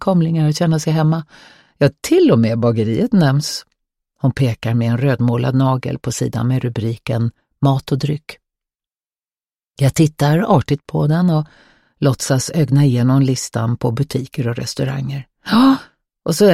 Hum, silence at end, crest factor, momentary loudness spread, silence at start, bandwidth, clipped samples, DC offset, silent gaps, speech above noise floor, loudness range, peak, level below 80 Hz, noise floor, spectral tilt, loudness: none; 0 s; 16 dB; 9 LU; 0 s; 14.5 kHz; under 0.1%; under 0.1%; none; over 75 dB; 4 LU; -2 dBFS; -48 dBFS; under -90 dBFS; -6.5 dB/octave; -17 LUFS